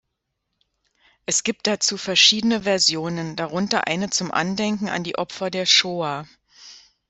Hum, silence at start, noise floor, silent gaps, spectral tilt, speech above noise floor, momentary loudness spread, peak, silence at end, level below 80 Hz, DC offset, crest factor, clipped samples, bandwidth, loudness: none; 1.3 s; -78 dBFS; none; -2.5 dB/octave; 56 dB; 13 LU; -2 dBFS; 0.3 s; -62 dBFS; under 0.1%; 22 dB; under 0.1%; 8.4 kHz; -20 LUFS